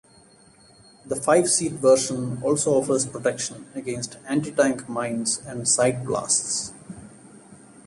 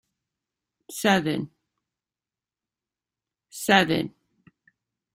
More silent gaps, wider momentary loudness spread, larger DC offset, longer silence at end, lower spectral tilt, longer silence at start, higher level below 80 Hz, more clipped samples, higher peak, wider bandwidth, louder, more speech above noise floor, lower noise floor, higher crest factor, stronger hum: neither; second, 13 LU vs 19 LU; neither; second, 0.3 s vs 1.05 s; about the same, -3.5 dB/octave vs -4 dB/octave; first, 1.05 s vs 0.9 s; about the same, -60 dBFS vs -64 dBFS; neither; about the same, -6 dBFS vs -4 dBFS; second, 11.5 kHz vs 16 kHz; about the same, -23 LUFS vs -23 LUFS; second, 30 dB vs over 68 dB; second, -53 dBFS vs under -90 dBFS; second, 18 dB vs 24 dB; neither